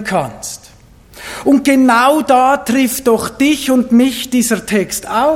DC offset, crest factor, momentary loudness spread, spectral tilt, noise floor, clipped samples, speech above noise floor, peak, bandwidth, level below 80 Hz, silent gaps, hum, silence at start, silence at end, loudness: under 0.1%; 12 dB; 15 LU; -4 dB/octave; -42 dBFS; under 0.1%; 30 dB; 0 dBFS; 17 kHz; -46 dBFS; none; none; 0 s; 0 s; -12 LUFS